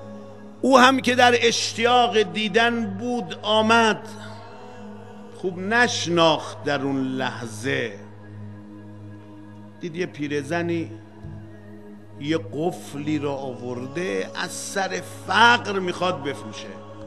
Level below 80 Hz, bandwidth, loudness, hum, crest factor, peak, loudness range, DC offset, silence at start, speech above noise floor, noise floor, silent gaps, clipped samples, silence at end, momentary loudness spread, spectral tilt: -64 dBFS; 13 kHz; -22 LUFS; none; 24 dB; 0 dBFS; 12 LU; 0.5%; 0 s; 20 dB; -42 dBFS; none; under 0.1%; 0 s; 25 LU; -4 dB/octave